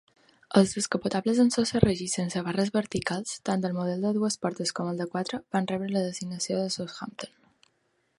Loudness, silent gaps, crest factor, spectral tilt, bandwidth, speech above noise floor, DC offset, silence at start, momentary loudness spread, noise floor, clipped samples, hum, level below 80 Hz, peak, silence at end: -28 LUFS; none; 26 dB; -5 dB/octave; 11.5 kHz; 45 dB; under 0.1%; 0.5 s; 9 LU; -72 dBFS; under 0.1%; none; -54 dBFS; -2 dBFS; 0.9 s